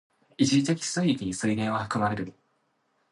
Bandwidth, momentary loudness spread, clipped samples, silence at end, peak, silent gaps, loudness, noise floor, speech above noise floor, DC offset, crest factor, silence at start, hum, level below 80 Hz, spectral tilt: 11.5 kHz; 6 LU; under 0.1%; 0.8 s; -10 dBFS; none; -27 LUFS; -72 dBFS; 46 dB; under 0.1%; 18 dB; 0.4 s; none; -60 dBFS; -5 dB/octave